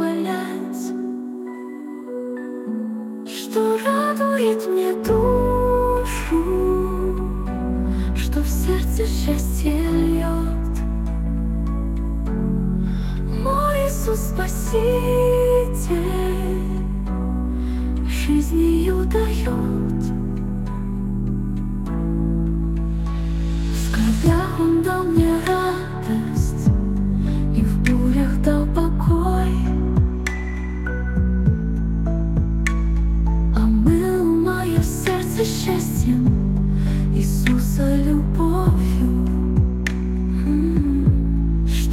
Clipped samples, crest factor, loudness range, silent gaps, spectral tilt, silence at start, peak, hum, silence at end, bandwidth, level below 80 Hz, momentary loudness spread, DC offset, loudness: under 0.1%; 16 dB; 4 LU; none; -7 dB/octave; 0 s; -4 dBFS; none; 0 s; 16 kHz; -24 dBFS; 7 LU; under 0.1%; -21 LUFS